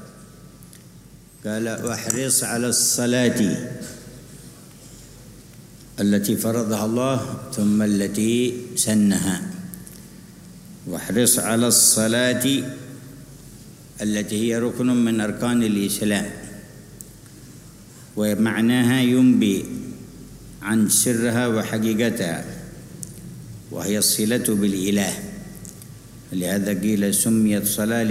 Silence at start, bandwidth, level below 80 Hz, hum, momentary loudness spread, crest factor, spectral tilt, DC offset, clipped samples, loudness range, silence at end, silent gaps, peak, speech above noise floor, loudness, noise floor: 0 s; 16 kHz; -52 dBFS; none; 22 LU; 22 dB; -4 dB/octave; under 0.1%; under 0.1%; 6 LU; 0 s; none; -2 dBFS; 25 dB; -20 LUFS; -46 dBFS